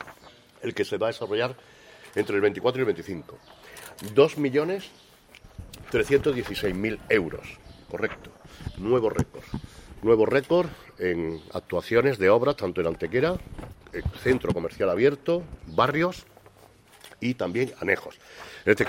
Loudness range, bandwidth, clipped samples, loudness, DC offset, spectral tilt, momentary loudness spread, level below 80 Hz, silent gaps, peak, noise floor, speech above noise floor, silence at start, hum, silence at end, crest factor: 4 LU; 16 kHz; under 0.1%; -26 LUFS; under 0.1%; -6 dB/octave; 21 LU; -48 dBFS; none; -4 dBFS; -54 dBFS; 29 dB; 0 s; none; 0 s; 22 dB